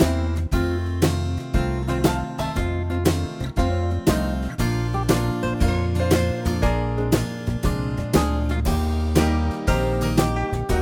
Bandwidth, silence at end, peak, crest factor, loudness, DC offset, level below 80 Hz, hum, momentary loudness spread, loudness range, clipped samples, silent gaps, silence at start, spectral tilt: 19 kHz; 0 s; -4 dBFS; 18 dB; -23 LUFS; under 0.1%; -28 dBFS; none; 5 LU; 1 LU; under 0.1%; none; 0 s; -6.5 dB/octave